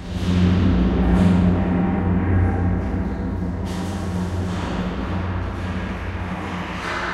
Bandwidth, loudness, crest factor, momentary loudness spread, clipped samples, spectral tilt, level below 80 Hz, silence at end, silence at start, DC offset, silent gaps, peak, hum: 11.5 kHz; -22 LUFS; 16 dB; 10 LU; under 0.1%; -7.5 dB/octave; -28 dBFS; 0 s; 0 s; under 0.1%; none; -6 dBFS; none